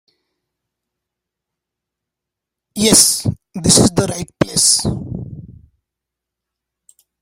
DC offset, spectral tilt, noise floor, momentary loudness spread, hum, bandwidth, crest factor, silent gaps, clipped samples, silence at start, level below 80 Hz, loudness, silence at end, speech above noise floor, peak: under 0.1%; -3 dB/octave; -83 dBFS; 20 LU; none; 16.5 kHz; 20 dB; none; under 0.1%; 2.75 s; -42 dBFS; -13 LUFS; 1.7 s; 68 dB; 0 dBFS